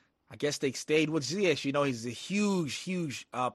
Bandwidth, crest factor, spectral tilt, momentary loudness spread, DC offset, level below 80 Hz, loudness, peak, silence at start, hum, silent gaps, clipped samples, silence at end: 12.5 kHz; 18 dB; -4.5 dB/octave; 7 LU; under 0.1%; -72 dBFS; -31 LUFS; -14 dBFS; 0.3 s; none; none; under 0.1%; 0 s